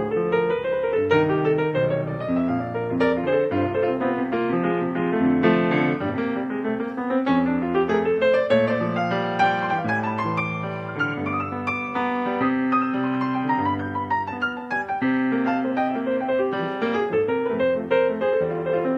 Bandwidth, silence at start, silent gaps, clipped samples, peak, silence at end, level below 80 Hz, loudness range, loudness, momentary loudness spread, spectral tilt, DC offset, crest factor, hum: 6.8 kHz; 0 s; none; under 0.1%; -6 dBFS; 0 s; -58 dBFS; 3 LU; -23 LUFS; 6 LU; -8 dB/octave; under 0.1%; 18 dB; none